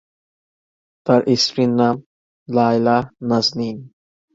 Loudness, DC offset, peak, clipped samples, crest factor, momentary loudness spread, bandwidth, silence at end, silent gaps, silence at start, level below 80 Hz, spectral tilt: -18 LUFS; under 0.1%; -2 dBFS; under 0.1%; 18 dB; 12 LU; 7.8 kHz; 0.45 s; 2.06-2.46 s; 1.05 s; -58 dBFS; -5.5 dB/octave